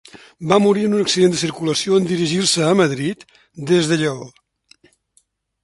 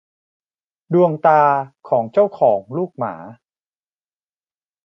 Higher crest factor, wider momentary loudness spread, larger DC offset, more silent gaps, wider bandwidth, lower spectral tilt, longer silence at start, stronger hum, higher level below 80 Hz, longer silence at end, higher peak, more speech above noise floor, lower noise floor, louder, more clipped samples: about the same, 18 dB vs 18 dB; about the same, 11 LU vs 13 LU; neither; neither; first, 11.5 kHz vs 6 kHz; second, -4.5 dB/octave vs -9.5 dB/octave; second, 0.15 s vs 0.9 s; neither; first, -58 dBFS vs -68 dBFS; second, 1.35 s vs 1.5 s; about the same, 0 dBFS vs -2 dBFS; second, 44 dB vs over 73 dB; second, -62 dBFS vs under -90 dBFS; about the same, -17 LUFS vs -17 LUFS; neither